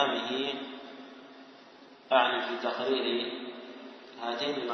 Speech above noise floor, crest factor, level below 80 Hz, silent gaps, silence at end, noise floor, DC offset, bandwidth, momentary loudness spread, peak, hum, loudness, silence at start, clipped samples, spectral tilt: 23 dB; 24 dB; -84 dBFS; none; 0 s; -53 dBFS; under 0.1%; 6.4 kHz; 23 LU; -10 dBFS; none; -30 LUFS; 0 s; under 0.1%; -3.5 dB/octave